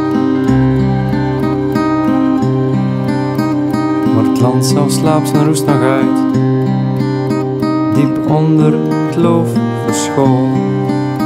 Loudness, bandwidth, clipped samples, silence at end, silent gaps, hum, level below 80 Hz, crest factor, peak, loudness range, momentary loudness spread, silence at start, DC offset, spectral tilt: -13 LUFS; 15.5 kHz; under 0.1%; 0 s; none; none; -38 dBFS; 12 dB; 0 dBFS; 2 LU; 4 LU; 0 s; under 0.1%; -7 dB/octave